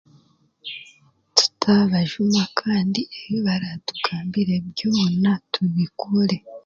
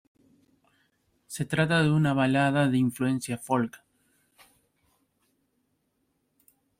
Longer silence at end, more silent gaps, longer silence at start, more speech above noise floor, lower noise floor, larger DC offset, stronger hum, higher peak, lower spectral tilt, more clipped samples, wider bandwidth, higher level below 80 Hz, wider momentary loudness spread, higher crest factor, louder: second, 0.05 s vs 3.05 s; neither; second, 0.65 s vs 1.3 s; second, 36 dB vs 50 dB; second, -58 dBFS vs -75 dBFS; neither; neither; first, 0 dBFS vs -12 dBFS; about the same, -5 dB/octave vs -6 dB/octave; neither; second, 7.8 kHz vs 16 kHz; first, -60 dBFS vs -66 dBFS; about the same, 10 LU vs 10 LU; about the same, 22 dB vs 18 dB; first, -21 LUFS vs -26 LUFS